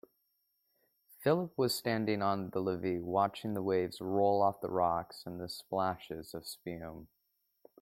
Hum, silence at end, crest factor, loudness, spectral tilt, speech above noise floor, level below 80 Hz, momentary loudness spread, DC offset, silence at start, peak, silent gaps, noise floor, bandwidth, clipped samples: none; 0.75 s; 18 dB; -34 LUFS; -5.5 dB/octave; 46 dB; -70 dBFS; 13 LU; under 0.1%; 1.2 s; -16 dBFS; none; -80 dBFS; 16.5 kHz; under 0.1%